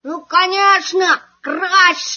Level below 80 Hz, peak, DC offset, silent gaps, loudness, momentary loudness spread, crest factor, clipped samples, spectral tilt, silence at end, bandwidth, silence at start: -74 dBFS; 0 dBFS; under 0.1%; none; -13 LUFS; 8 LU; 16 dB; under 0.1%; 1 dB/octave; 0 s; 7 kHz; 0.05 s